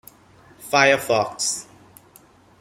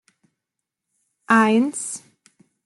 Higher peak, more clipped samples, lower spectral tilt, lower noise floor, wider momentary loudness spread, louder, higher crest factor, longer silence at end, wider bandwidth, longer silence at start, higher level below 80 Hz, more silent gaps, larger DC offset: about the same, -2 dBFS vs -4 dBFS; neither; second, -2 dB/octave vs -4 dB/octave; second, -52 dBFS vs -83 dBFS; about the same, 13 LU vs 15 LU; about the same, -20 LUFS vs -19 LUFS; about the same, 22 dB vs 18 dB; first, 1 s vs 0.65 s; first, 16 kHz vs 12 kHz; second, 0.6 s vs 1.3 s; first, -62 dBFS vs -74 dBFS; neither; neither